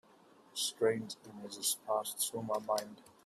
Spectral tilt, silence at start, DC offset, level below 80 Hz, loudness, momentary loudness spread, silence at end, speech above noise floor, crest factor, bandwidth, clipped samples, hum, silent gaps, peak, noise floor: -2.5 dB/octave; 0.55 s; under 0.1%; -80 dBFS; -36 LUFS; 14 LU; 0.15 s; 26 dB; 18 dB; 15.5 kHz; under 0.1%; none; none; -20 dBFS; -63 dBFS